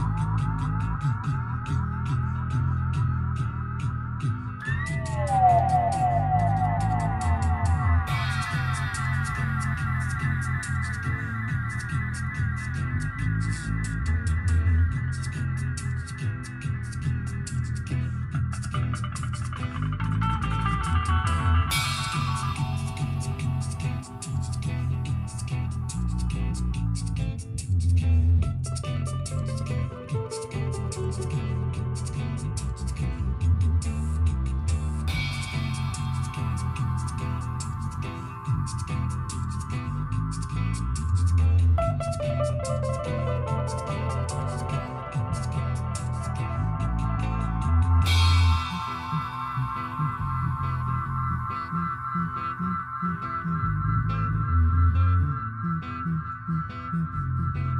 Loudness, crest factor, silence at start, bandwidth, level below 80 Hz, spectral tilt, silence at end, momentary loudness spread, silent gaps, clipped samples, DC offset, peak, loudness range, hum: -27 LUFS; 16 dB; 0 s; 12.5 kHz; -34 dBFS; -6 dB/octave; 0 s; 8 LU; none; under 0.1%; under 0.1%; -10 dBFS; 5 LU; none